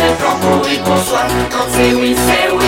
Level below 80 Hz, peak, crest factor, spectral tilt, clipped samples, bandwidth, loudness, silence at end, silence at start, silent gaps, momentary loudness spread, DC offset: -32 dBFS; 0 dBFS; 12 dB; -4 dB/octave; under 0.1%; 17.5 kHz; -13 LUFS; 0 s; 0 s; none; 3 LU; 0.4%